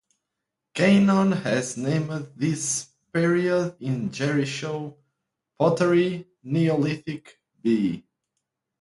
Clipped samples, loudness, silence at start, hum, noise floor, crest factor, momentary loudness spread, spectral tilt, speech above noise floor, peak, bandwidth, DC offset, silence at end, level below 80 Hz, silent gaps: under 0.1%; -24 LUFS; 0.75 s; none; -84 dBFS; 18 dB; 13 LU; -5.5 dB/octave; 61 dB; -6 dBFS; 11.5 kHz; under 0.1%; 0.8 s; -64 dBFS; none